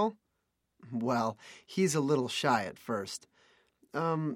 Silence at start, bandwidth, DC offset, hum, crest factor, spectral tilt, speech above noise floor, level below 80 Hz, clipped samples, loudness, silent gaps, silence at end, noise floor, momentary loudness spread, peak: 0 s; 16 kHz; under 0.1%; none; 20 dB; -5 dB/octave; 49 dB; -76 dBFS; under 0.1%; -32 LUFS; none; 0 s; -81 dBFS; 12 LU; -14 dBFS